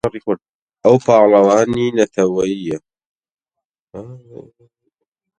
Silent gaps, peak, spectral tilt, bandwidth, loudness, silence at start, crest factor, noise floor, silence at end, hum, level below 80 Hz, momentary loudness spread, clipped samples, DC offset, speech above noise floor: 0.55-0.67 s, 3.06-3.21 s, 3.34-3.38 s, 3.65-3.70 s, 3.79-3.87 s; 0 dBFS; -6 dB/octave; 9.6 kHz; -15 LUFS; 0.05 s; 16 dB; -83 dBFS; 1.25 s; none; -54 dBFS; 24 LU; under 0.1%; under 0.1%; 68 dB